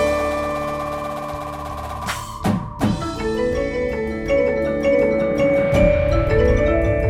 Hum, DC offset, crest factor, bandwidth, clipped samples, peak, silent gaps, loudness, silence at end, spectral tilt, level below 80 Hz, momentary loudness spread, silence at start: none; under 0.1%; 16 dB; 15.5 kHz; under 0.1%; -4 dBFS; none; -20 LUFS; 0 s; -6.5 dB/octave; -28 dBFS; 11 LU; 0 s